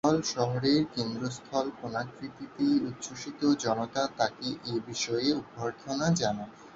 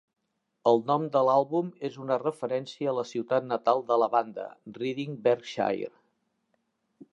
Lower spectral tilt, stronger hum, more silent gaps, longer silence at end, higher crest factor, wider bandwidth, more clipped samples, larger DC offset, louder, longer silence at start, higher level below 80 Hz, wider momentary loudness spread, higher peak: second, -5 dB/octave vs -6.5 dB/octave; neither; neither; second, 0 s vs 1.25 s; about the same, 20 dB vs 20 dB; second, 8 kHz vs 11 kHz; neither; neither; about the same, -30 LUFS vs -28 LUFS; second, 0.05 s vs 0.65 s; first, -64 dBFS vs -80 dBFS; about the same, 10 LU vs 11 LU; second, -12 dBFS vs -8 dBFS